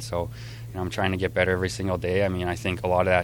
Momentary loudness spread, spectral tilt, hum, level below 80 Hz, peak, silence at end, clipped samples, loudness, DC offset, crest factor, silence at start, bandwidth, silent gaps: 10 LU; -5.5 dB/octave; none; -46 dBFS; -4 dBFS; 0 s; under 0.1%; -26 LUFS; under 0.1%; 20 dB; 0 s; over 20 kHz; none